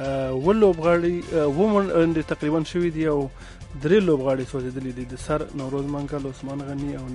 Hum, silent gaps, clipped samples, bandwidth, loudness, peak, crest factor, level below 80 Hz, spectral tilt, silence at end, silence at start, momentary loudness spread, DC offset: none; none; under 0.1%; 11.5 kHz; -23 LUFS; -6 dBFS; 16 dB; -42 dBFS; -7.5 dB/octave; 0 s; 0 s; 13 LU; under 0.1%